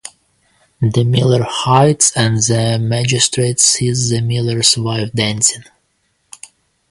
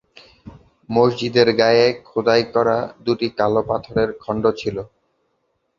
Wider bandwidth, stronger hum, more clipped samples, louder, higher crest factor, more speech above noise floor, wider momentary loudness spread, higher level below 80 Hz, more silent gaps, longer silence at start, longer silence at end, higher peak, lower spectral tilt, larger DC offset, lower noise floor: first, 11.5 kHz vs 7.4 kHz; neither; neither; first, -13 LUFS vs -19 LUFS; about the same, 16 dB vs 18 dB; about the same, 49 dB vs 51 dB; about the same, 6 LU vs 8 LU; about the same, -46 dBFS vs -50 dBFS; neither; second, 0.05 s vs 0.45 s; first, 1.3 s vs 0.9 s; about the same, 0 dBFS vs 0 dBFS; second, -3.5 dB/octave vs -6 dB/octave; neither; second, -63 dBFS vs -69 dBFS